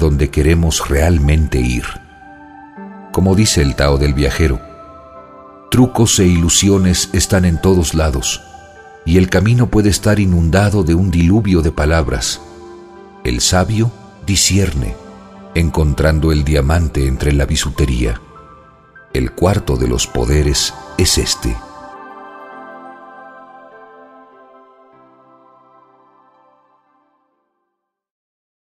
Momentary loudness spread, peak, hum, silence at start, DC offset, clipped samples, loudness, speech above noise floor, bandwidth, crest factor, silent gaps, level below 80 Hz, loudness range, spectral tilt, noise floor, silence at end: 22 LU; 0 dBFS; none; 0 s; under 0.1%; under 0.1%; -14 LUFS; 62 dB; 15.5 kHz; 14 dB; none; -22 dBFS; 4 LU; -5 dB/octave; -74 dBFS; 5.25 s